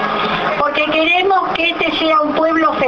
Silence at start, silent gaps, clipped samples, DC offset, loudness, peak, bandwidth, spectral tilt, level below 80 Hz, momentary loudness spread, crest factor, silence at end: 0 s; none; under 0.1%; under 0.1%; -14 LUFS; -2 dBFS; 6.8 kHz; -5 dB/octave; -48 dBFS; 4 LU; 14 dB; 0 s